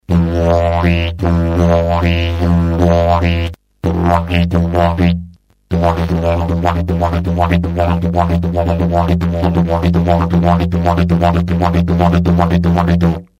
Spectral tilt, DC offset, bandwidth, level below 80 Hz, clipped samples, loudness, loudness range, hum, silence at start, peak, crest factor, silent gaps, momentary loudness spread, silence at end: -8.5 dB/octave; under 0.1%; 7.6 kHz; -24 dBFS; under 0.1%; -14 LUFS; 2 LU; none; 0.1 s; 0 dBFS; 12 dB; none; 3 LU; 0.15 s